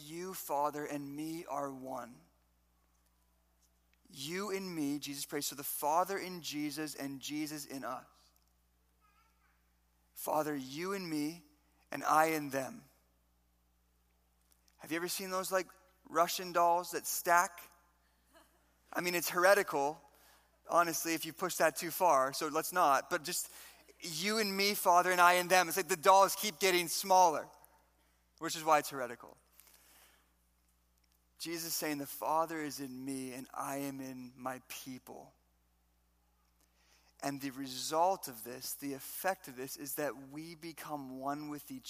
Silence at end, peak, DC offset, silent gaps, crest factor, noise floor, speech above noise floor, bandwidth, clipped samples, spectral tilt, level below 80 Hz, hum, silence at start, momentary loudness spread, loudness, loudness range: 0 s; -12 dBFS; under 0.1%; none; 24 dB; -74 dBFS; 39 dB; 15.5 kHz; under 0.1%; -2.5 dB/octave; -76 dBFS; 60 Hz at -75 dBFS; 0 s; 17 LU; -34 LUFS; 15 LU